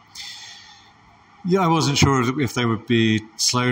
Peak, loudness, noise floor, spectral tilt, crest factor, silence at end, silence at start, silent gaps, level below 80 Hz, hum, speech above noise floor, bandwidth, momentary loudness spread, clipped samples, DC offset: -4 dBFS; -19 LUFS; -51 dBFS; -4.5 dB/octave; 18 dB; 0 s; 0.15 s; none; -48 dBFS; none; 32 dB; 16 kHz; 17 LU; under 0.1%; under 0.1%